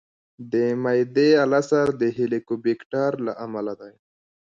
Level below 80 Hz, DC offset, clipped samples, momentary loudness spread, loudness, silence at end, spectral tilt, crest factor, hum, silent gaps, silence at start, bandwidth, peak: -66 dBFS; under 0.1%; under 0.1%; 12 LU; -22 LUFS; 0.6 s; -6.5 dB/octave; 18 dB; none; 2.86-2.90 s; 0.4 s; 7.8 kHz; -6 dBFS